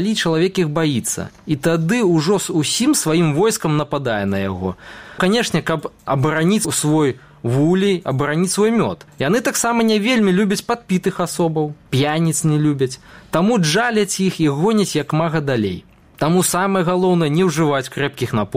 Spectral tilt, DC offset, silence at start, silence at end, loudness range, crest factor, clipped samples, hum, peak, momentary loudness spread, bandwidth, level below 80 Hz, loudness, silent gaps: -5 dB/octave; 0.2%; 0 s; 0 s; 2 LU; 14 dB; under 0.1%; none; -4 dBFS; 8 LU; 16 kHz; -52 dBFS; -18 LUFS; none